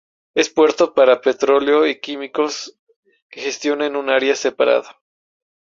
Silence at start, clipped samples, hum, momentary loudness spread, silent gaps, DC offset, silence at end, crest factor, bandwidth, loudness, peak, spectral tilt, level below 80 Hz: 0.35 s; under 0.1%; none; 12 LU; 2.79-2.87 s, 2.96-3.03 s, 3.22-3.30 s; under 0.1%; 0.9 s; 16 dB; 7.6 kHz; -17 LUFS; -2 dBFS; -2.5 dB/octave; -64 dBFS